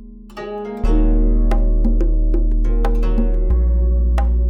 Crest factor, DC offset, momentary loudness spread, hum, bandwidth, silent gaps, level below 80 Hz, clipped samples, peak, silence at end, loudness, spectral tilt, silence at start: 8 dB; under 0.1%; 10 LU; none; 3.6 kHz; none; -14 dBFS; under 0.1%; -6 dBFS; 0 s; -19 LUFS; -9.5 dB/octave; 0 s